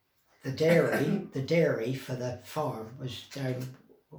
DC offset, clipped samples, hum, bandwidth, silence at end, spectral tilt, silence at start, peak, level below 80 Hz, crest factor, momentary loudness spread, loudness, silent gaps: under 0.1%; under 0.1%; none; over 20 kHz; 0 s; -6.5 dB/octave; 0.45 s; -12 dBFS; -70 dBFS; 20 dB; 15 LU; -30 LUFS; none